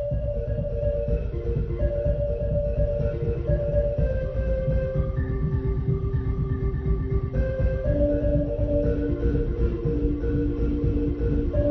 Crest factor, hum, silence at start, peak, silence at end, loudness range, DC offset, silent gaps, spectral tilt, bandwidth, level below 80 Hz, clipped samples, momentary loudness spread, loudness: 14 dB; none; 0 s; -10 dBFS; 0 s; 1 LU; under 0.1%; none; -11.5 dB/octave; 4.1 kHz; -28 dBFS; under 0.1%; 3 LU; -26 LUFS